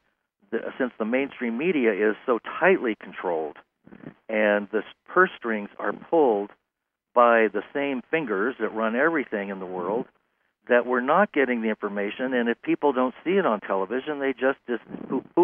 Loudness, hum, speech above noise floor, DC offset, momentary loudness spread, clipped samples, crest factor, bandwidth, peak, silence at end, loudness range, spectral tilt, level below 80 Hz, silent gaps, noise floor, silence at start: -25 LUFS; none; 59 dB; under 0.1%; 10 LU; under 0.1%; 20 dB; 3.7 kHz; -6 dBFS; 0 s; 2 LU; -9 dB/octave; -74 dBFS; none; -83 dBFS; 0.5 s